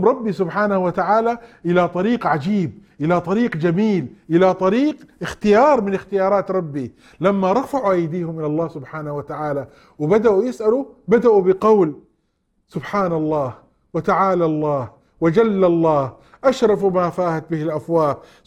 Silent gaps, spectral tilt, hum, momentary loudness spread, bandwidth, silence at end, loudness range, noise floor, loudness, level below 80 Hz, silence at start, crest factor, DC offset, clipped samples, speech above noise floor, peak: none; -8 dB/octave; none; 12 LU; 12 kHz; 0.3 s; 3 LU; -67 dBFS; -19 LUFS; -54 dBFS; 0 s; 16 dB; under 0.1%; under 0.1%; 49 dB; -2 dBFS